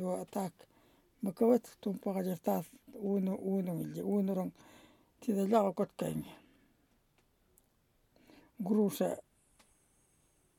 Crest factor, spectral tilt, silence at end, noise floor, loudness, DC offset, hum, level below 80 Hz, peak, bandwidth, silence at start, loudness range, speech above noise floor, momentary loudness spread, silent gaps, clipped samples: 20 dB; -7.5 dB/octave; 1.4 s; -73 dBFS; -35 LUFS; under 0.1%; none; -76 dBFS; -16 dBFS; 18 kHz; 0 s; 5 LU; 39 dB; 13 LU; none; under 0.1%